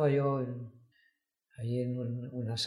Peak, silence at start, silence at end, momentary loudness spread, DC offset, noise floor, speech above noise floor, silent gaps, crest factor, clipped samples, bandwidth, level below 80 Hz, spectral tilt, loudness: -18 dBFS; 0 s; 0 s; 13 LU; under 0.1%; -75 dBFS; 42 dB; none; 16 dB; under 0.1%; 12 kHz; -74 dBFS; -6.5 dB/octave; -35 LUFS